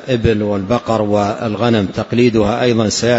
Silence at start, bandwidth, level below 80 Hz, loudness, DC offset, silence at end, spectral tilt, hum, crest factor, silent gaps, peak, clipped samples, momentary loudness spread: 0 s; 8 kHz; -38 dBFS; -15 LUFS; under 0.1%; 0 s; -5.5 dB/octave; none; 14 dB; none; 0 dBFS; under 0.1%; 4 LU